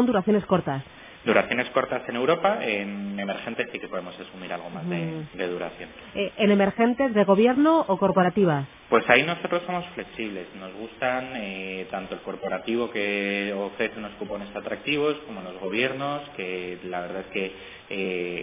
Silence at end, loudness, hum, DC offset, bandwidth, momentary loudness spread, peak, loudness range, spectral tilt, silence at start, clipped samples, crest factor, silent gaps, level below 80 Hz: 0 s; -25 LUFS; none; under 0.1%; 3.8 kHz; 14 LU; -2 dBFS; 9 LU; -9.5 dB/octave; 0 s; under 0.1%; 24 dB; none; -60 dBFS